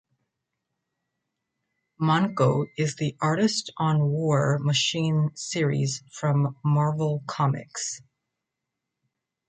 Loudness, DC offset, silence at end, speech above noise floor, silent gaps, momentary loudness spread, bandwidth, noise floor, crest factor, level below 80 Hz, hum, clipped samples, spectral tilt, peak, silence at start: -25 LUFS; under 0.1%; 1.5 s; 60 dB; none; 6 LU; 9.2 kHz; -84 dBFS; 18 dB; -66 dBFS; none; under 0.1%; -5.5 dB/octave; -8 dBFS; 2 s